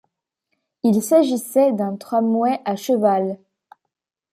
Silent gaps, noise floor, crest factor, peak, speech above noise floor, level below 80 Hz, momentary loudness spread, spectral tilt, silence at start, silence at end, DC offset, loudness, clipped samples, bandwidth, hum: none; -80 dBFS; 16 dB; -4 dBFS; 62 dB; -72 dBFS; 8 LU; -6 dB/octave; 0.85 s; 1 s; under 0.1%; -19 LUFS; under 0.1%; 15.5 kHz; none